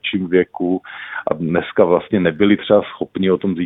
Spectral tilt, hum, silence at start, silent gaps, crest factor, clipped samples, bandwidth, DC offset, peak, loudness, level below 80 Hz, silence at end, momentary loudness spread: -10 dB/octave; none; 0.05 s; none; 16 dB; under 0.1%; 4 kHz; under 0.1%; 0 dBFS; -17 LUFS; -52 dBFS; 0 s; 9 LU